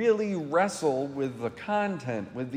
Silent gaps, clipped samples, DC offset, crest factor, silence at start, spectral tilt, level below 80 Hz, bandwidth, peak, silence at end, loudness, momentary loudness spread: none; under 0.1%; under 0.1%; 16 dB; 0 s; -5.5 dB/octave; -70 dBFS; 15 kHz; -12 dBFS; 0 s; -29 LUFS; 8 LU